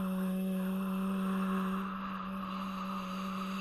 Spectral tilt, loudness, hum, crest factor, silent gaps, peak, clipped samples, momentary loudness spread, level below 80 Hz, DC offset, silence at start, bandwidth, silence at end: -7 dB/octave; -36 LUFS; none; 10 dB; none; -26 dBFS; under 0.1%; 5 LU; -62 dBFS; under 0.1%; 0 s; 13.5 kHz; 0 s